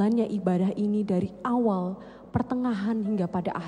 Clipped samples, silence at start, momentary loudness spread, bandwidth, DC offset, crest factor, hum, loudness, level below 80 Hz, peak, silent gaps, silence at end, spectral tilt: under 0.1%; 0 s; 6 LU; 9.8 kHz; under 0.1%; 16 dB; none; -27 LUFS; -56 dBFS; -10 dBFS; none; 0 s; -9 dB/octave